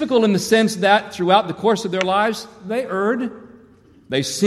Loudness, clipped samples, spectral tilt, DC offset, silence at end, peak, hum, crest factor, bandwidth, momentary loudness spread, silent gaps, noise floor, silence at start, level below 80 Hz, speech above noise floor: -19 LUFS; under 0.1%; -4.5 dB/octave; under 0.1%; 0 s; -2 dBFS; none; 18 dB; 14.5 kHz; 9 LU; none; -49 dBFS; 0 s; -60 dBFS; 31 dB